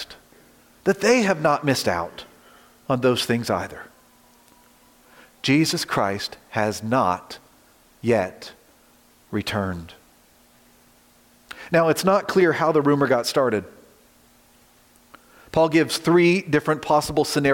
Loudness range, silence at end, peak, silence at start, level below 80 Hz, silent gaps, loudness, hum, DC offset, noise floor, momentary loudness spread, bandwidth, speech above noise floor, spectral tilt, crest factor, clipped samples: 8 LU; 0 s; -6 dBFS; 0 s; -58 dBFS; none; -21 LUFS; none; under 0.1%; -56 dBFS; 16 LU; 17 kHz; 35 dB; -5 dB/octave; 18 dB; under 0.1%